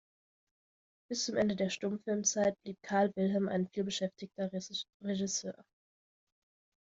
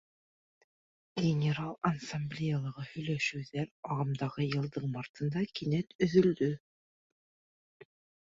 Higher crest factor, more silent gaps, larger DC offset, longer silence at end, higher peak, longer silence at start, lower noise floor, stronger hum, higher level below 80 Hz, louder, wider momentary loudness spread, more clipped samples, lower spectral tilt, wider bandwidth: about the same, 18 dB vs 22 dB; second, 4.94-5.00 s vs 3.71-3.83 s, 5.09-5.14 s, 5.95-5.99 s; neither; second, 1.35 s vs 1.75 s; second, -18 dBFS vs -12 dBFS; about the same, 1.1 s vs 1.15 s; about the same, under -90 dBFS vs under -90 dBFS; neither; second, -74 dBFS vs -66 dBFS; about the same, -34 LUFS vs -33 LUFS; about the same, 10 LU vs 10 LU; neither; second, -4 dB/octave vs -7 dB/octave; about the same, 7.8 kHz vs 7.8 kHz